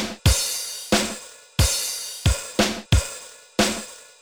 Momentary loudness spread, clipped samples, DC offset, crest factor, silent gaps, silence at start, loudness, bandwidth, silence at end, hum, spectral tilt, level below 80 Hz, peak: 11 LU; under 0.1%; under 0.1%; 18 dB; none; 0 s; -23 LUFS; over 20 kHz; 0.2 s; none; -3.5 dB/octave; -30 dBFS; -6 dBFS